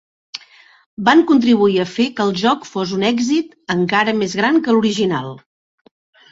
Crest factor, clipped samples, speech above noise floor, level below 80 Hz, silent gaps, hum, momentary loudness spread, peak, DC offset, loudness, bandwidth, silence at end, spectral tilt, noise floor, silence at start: 16 dB; under 0.1%; 31 dB; -58 dBFS; 0.86-0.97 s; none; 12 LU; -2 dBFS; under 0.1%; -16 LUFS; 7.8 kHz; 0.95 s; -5 dB/octave; -46 dBFS; 0.35 s